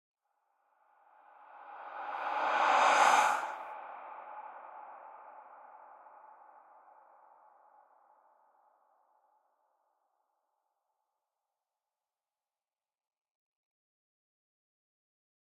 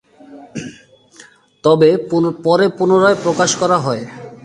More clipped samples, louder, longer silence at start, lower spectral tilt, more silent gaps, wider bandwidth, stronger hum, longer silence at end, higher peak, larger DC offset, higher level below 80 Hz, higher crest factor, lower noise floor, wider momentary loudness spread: neither; second, -29 LUFS vs -14 LUFS; first, 1.55 s vs 0.3 s; second, 0 dB/octave vs -5 dB/octave; neither; first, 14 kHz vs 11 kHz; neither; first, 10.05 s vs 0.1 s; second, -14 dBFS vs 0 dBFS; neither; second, under -90 dBFS vs -58 dBFS; first, 26 dB vs 16 dB; first, under -90 dBFS vs -45 dBFS; first, 29 LU vs 18 LU